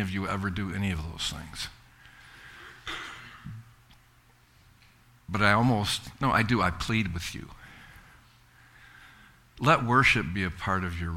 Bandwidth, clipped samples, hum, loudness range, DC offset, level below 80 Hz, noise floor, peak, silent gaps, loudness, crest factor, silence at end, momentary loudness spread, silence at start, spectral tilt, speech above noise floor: 16.5 kHz; under 0.1%; none; 15 LU; under 0.1%; -48 dBFS; -60 dBFS; -6 dBFS; none; -27 LUFS; 24 dB; 0 s; 24 LU; 0 s; -5 dB/octave; 33 dB